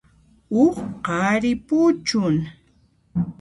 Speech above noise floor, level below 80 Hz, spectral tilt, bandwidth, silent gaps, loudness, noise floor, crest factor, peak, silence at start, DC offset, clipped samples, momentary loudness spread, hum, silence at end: 40 dB; -52 dBFS; -6 dB/octave; 11.5 kHz; none; -21 LUFS; -59 dBFS; 16 dB; -6 dBFS; 0.5 s; under 0.1%; under 0.1%; 9 LU; none; 0.1 s